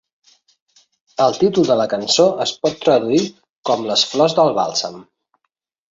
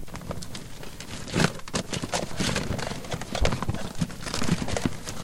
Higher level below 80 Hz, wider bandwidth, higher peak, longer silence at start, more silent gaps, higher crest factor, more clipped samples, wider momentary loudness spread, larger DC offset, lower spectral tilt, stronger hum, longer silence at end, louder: second, -60 dBFS vs -38 dBFS; second, 7.8 kHz vs 16.5 kHz; first, -2 dBFS vs -6 dBFS; first, 1.2 s vs 0 s; first, 3.50-3.63 s vs none; second, 16 dB vs 22 dB; neither; second, 8 LU vs 12 LU; neither; about the same, -4 dB/octave vs -4.5 dB/octave; neither; first, 0.9 s vs 0 s; first, -17 LUFS vs -30 LUFS